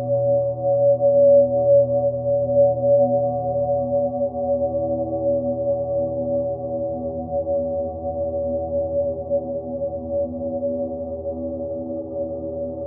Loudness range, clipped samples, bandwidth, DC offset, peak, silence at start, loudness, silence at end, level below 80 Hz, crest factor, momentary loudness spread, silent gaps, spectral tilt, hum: 8 LU; under 0.1%; 1.3 kHz; under 0.1%; -6 dBFS; 0 s; -21 LUFS; 0 s; -50 dBFS; 14 dB; 12 LU; none; -17 dB/octave; none